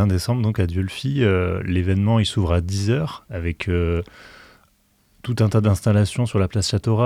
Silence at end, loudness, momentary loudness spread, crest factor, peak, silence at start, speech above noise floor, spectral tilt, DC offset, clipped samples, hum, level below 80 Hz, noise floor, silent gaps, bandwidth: 0 s; -21 LUFS; 9 LU; 16 dB; -4 dBFS; 0 s; 41 dB; -6.5 dB/octave; under 0.1%; under 0.1%; none; -42 dBFS; -61 dBFS; none; 13.5 kHz